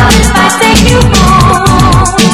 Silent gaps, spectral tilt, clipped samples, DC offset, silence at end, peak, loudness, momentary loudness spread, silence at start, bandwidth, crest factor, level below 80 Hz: none; -4.5 dB/octave; 6%; 1%; 0 s; 0 dBFS; -5 LUFS; 1 LU; 0 s; 19 kHz; 6 dB; -14 dBFS